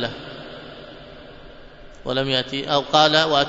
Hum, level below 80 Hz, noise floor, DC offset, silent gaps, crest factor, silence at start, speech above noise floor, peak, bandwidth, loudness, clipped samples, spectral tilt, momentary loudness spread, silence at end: none; -48 dBFS; -42 dBFS; under 0.1%; none; 22 dB; 0 s; 23 dB; -2 dBFS; 8 kHz; -19 LUFS; under 0.1%; -4 dB/octave; 25 LU; 0 s